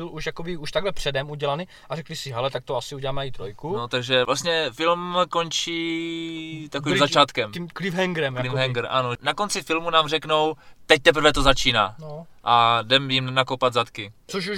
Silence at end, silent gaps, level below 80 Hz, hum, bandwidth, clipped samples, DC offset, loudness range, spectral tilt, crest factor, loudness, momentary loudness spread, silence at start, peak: 0 s; none; -42 dBFS; none; 16 kHz; under 0.1%; under 0.1%; 8 LU; -4 dB/octave; 24 dB; -22 LUFS; 13 LU; 0 s; 0 dBFS